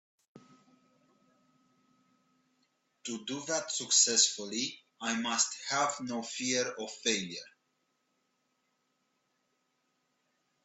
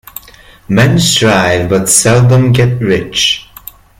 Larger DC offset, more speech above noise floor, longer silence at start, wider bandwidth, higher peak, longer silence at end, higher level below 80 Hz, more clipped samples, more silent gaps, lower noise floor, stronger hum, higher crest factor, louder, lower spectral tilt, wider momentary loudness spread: neither; first, 46 dB vs 29 dB; second, 0.35 s vs 0.7 s; second, 8.6 kHz vs over 20 kHz; second, -12 dBFS vs 0 dBFS; first, 3.15 s vs 0.6 s; second, -84 dBFS vs -36 dBFS; neither; neither; first, -79 dBFS vs -37 dBFS; neither; first, 24 dB vs 10 dB; second, -30 LUFS vs -9 LUFS; second, -0.5 dB/octave vs -4 dB/octave; first, 15 LU vs 7 LU